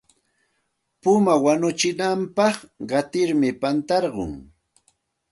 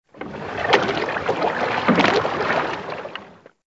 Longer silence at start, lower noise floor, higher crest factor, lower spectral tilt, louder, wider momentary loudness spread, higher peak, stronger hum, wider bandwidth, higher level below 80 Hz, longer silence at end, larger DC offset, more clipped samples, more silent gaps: first, 1.05 s vs 0.15 s; first, -73 dBFS vs -44 dBFS; about the same, 18 dB vs 22 dB; about the same, -5 dB/octave vs -5 dB/octave; about the same, -21 LUFS vs -21 LUFS; second, 11 LU vs 15 LU; second, -6 dBFS vs 0 dBFS; neither; first, 11.5 kHz vs 8 kHz; about the same, -54 dBFS vs -54 dBFS; first, 0.9 s vs 0.3 s; neither; neither; neither